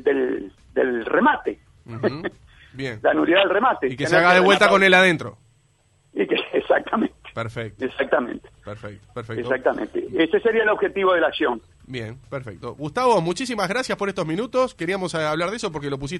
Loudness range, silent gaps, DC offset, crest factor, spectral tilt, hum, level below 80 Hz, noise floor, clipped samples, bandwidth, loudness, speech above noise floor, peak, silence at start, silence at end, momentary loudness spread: 8 LU; none; under 0.1%; 18 dB; -5 dB/octave; none; -54 dBFS; -61 dBFS; under 0.1%; 12 kHz; -20 LUFS; 40 dB; -2 dBFS; 0 s; 0 s; 19 LU